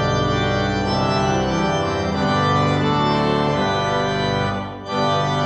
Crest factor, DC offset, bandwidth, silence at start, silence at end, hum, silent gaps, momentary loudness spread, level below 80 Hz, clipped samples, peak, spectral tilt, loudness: 14 dB; under 0.1%; 8.8 kHz; 0 s; 0 s; none; none; 4 LU; -38 dBFS; under 0.1%; -6 dBFS; -6 dB/octave; -19 LUFS